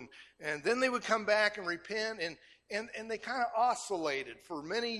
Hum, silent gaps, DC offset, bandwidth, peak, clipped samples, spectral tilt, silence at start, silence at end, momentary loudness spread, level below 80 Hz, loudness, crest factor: none; none; under 0.1%; 14 kHz; -14 dBFS; under 0.1%; -2.5 dB/octave; 0 s; 0 s; 12 LU; -74 dBFS; -34 LUFS; 20 dB